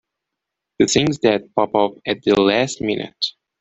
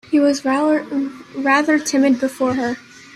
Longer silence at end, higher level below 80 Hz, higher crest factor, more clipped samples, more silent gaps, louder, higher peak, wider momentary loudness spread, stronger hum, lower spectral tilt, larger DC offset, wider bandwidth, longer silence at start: about the same, 0.3 s vs 0.35 s; first, -52 dBFS vs -60 dBFS; about the same, 18 dB vs 16 dB; neither; neither; about the same, -19 LUFS vs -18 LUFS; about the same, -2 dBFS vs -2 dBFS; about the same, 8 LU vs 9 LU; neither; about the same, -4 dB/octave vs -3.5 dB/octave; neither; second, 8.2 kHz vs 14 kHz; first, 0.8 s vs 0.1 s